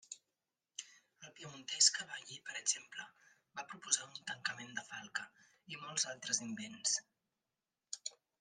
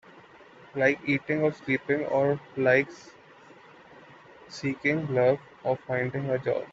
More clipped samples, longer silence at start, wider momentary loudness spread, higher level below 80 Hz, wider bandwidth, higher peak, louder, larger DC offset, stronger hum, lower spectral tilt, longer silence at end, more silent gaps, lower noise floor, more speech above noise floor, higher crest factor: neither; about the same, 0.1 s vs 0.15 s; first, 20 LU vs 10 LU; second, under -90 dBFS vs -68 dBFS; first, 12 kHz vs 7.8 kHz; second, -14 dBFS vs -8 dBFS; second, -37 LUFS vs -27 LUFS; neither; neither; second, 0.5 dB/octave vs -7 dB/octave; first, 0.3 s vs 0 s; neither; first, under -90 dBFS vs -52 dBFS; first, over 49 dB vs 26 dB; first, 28 dB vs 22 dB